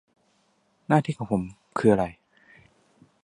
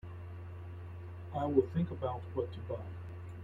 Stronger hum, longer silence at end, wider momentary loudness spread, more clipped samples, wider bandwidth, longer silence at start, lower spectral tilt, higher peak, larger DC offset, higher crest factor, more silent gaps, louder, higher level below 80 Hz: neither; first, 1.1 s vs 0 s; second, 11 LU vs 16 LU; neither; first, 11 kHz vs 7.2 kHz; first, 0.9 s vs 0.05 s; second, -8 dB/octave vs -10 dB/octave; first, -4 dBFS vs -14 dBFS; neither; about the same, 24 dB vs 22 dB; neither; first, -25 LUFS vs -38 LUFS; about the same, -56 dBFS vs -60 dBFS